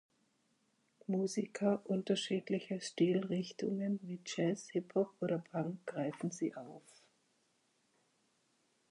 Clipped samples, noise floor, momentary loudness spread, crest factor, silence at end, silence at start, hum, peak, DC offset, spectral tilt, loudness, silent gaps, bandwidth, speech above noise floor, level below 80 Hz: under 0.1%; -77 dBFS; 7 LU; 20 dB; 2.1 s; 1.1 s; none; -20 dBFS; under 0.1%; -6 dB/octave; -38 LUFS; none; 11.5 kHz; 40 dB; -88 dBFS